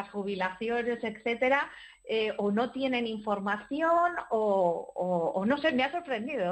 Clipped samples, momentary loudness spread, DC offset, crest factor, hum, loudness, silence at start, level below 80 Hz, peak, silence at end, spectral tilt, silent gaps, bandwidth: under 0.1%; 7 LU; under 0.1%; 16 dB; none; -30 LUFS; 0 s; -68 dBFS; -14 dBFS; 0 s; -6.5 dB/octave; none; 8.4 kHz